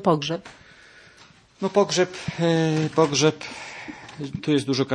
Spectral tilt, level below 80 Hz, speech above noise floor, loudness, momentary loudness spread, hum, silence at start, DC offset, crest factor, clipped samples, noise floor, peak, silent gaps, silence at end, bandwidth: -5 dB/octave; -60 dBFS; 30 dB; -23 LUFS; 15 LU; none; 0 s; under 0.1%; 20 dB; under 0.1%; -52 dBFS; -4 dBFS; none; 0 s; 10.5 kHz